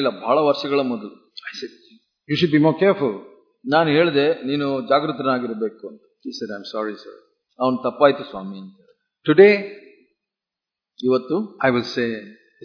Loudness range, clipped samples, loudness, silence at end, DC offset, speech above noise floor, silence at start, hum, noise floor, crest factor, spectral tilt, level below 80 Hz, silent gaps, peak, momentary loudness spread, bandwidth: 5 LU; under 0.1%; -20 LUFS; 0.3 s; under 0.1%; 68 dB; 0 s; none; -87 dBFS; 20 dB; -7 dB/octave; -68 dBFS; none; 0 dBFS; 19 LU; 5.4 kHz